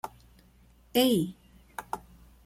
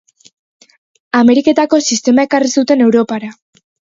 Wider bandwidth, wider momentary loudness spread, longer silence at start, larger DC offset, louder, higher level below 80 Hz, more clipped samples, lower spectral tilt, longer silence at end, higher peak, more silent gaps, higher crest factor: first, 16.5 kHz vs 7.8 kHz; first, 20 LU vs 9 LU; second, 0.05 s vs 1.15 s; neither; second, -29 LUFS vs -12 LUFS; about the same, -58 dBFS vs -58 dBFS; neither; first, -5 dB/octave vs -3.5 dB/octave; about the same, 0.5 s vs 0.55 s; second, -10 dBFS vs 0 dBFS; neither; first, 22 dB vs 14 dB